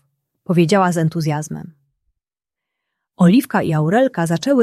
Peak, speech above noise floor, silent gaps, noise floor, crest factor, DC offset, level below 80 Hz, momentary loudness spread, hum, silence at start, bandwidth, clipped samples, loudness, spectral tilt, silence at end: -2 dBFS; 71 dB; none; -86 dBFS; 16 dB; under 0.1%; -60 dBFS; 9 LU; none; 0.5 s; 14 kHz; under 0.1%; -16 LUFS; -6.5 dB/octave; 0 s